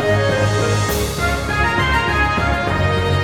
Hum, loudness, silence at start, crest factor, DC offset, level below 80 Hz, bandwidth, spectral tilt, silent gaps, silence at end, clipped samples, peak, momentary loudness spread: none; -17 LUFS; 0 s; 12 dB; under 0.1%; -28 dBFS; 18 kHz; -5 dB/octave; none; 0 s; under 0.1%; -4 dBFS; 3 LU